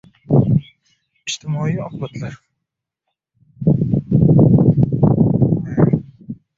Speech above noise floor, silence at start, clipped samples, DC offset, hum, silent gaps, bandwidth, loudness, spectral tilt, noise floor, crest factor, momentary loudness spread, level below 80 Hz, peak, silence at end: 57 dB; 0.3 s; under 0.1%; under 0.1%; none; none; 7.6 kHz; -16 LUFS; -8 dB/octave; -80 dBFS; 16 dB; 17 LU; -40 dBFS; -2 dBFS; 0.25 s